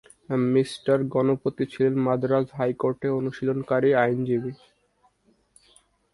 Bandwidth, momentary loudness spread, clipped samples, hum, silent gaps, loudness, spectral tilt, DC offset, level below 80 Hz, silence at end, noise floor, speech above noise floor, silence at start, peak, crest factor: 11.5 kHz; 6 LU; under 0.1%; none; none; -24 LUFS; -8 dB/octave; under 0.1%; -64 dBFS; 1.6 s; -66 dBFS; 42 dB; 0.3 s; -6 dBFS; 18 dB